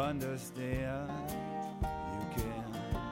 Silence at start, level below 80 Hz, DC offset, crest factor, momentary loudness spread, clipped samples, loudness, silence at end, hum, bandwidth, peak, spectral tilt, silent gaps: 0 s; -48 dBFS; under 0.1%; 16 dB; 3 LU; under 0.1%; -39 LUFS; 0 s; none; 16.5 kHz; -22 dBFS; -6 dB/octave; none